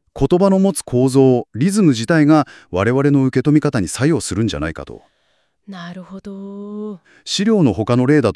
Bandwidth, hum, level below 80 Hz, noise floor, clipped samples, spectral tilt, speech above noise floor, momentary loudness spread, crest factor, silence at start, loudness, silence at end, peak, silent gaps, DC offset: 12 kHz; none; -44 dBFS; -64 dBFS; under 0.1%; -6.5 dB/octave; 48 dB; 19 LU; 14 dB; 0.15 s; -15 LUFS; 0 s; -2 dBFS; none; under 0.1%